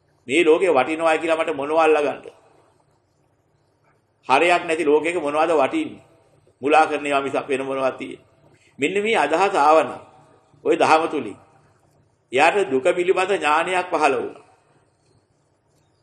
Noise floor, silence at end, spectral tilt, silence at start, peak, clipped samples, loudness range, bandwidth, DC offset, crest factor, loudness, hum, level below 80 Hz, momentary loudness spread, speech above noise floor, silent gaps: -64 dBFS; 1.65 s; -4 dB/octave; 0.25 s; 0 dBFS; under 0.1%; 3 LU; 10.5 kHz; under 0.1%; 20 dB; -19 LUFS; none; -70 dBFS; 12 LU; 45 dB; none